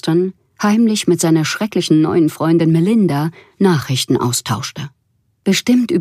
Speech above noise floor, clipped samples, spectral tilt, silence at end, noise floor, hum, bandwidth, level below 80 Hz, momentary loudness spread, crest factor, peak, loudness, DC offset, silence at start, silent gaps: 48 dB; under 0.1%; -5.5 dB/octave; 0 s; -63 dBFS; none; 15.5 kHz; -58 dBFS; 10 LU; 14 dB; -2 dBFS; -15 LUFS; under 0.1%; 0.05 s; none